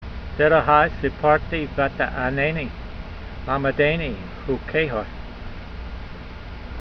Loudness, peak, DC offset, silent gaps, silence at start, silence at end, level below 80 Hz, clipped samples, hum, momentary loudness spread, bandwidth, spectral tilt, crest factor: -21 LUFS; -2 dBFS; under 0.1%; none; 0 s; 0 s; -36 dBFS; under 0.1%; none; 19 LU; 6.2 kHz; -8 dB/octave; 20 dB